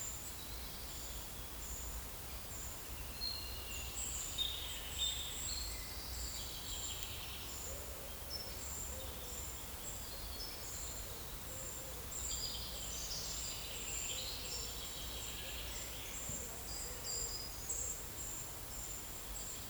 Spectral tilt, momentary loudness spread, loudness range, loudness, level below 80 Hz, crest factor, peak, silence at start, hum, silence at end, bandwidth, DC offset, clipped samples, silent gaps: -1.5 dB/octave; 5 LU; 4 LU; -42 LUFS; -52 dBFS; 24 dB; -22 dBFS; 0 s; none; 0 s; over 20 kHz; under 0.1%; under 0.1%; none